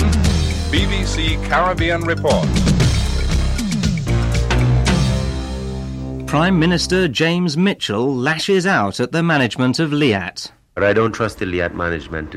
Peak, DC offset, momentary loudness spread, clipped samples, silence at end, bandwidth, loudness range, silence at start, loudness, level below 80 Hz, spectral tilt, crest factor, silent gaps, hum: -4 dBFS; under 0.1%; 7 LU; under 0.1%; 0 s; 15 kHz; 2 LU; 0 s; -18 LUFS; -24 dBFS; -5.5 dB/octave; 14 dB; none; none